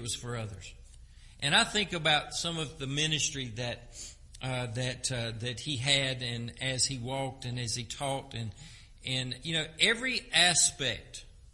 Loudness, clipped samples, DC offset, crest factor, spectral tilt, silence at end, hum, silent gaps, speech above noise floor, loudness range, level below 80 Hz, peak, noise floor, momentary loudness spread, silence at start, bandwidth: -30 LUFS; under 0.1%; under 0.1%; 24 dB; -2.5 dB/octave; 0.05 s; none; none; 20 dB; 5 LU; -54 dBFS; -8 dBFS; -52 dBFS; 17 LU; 0 s; 11.5 kHz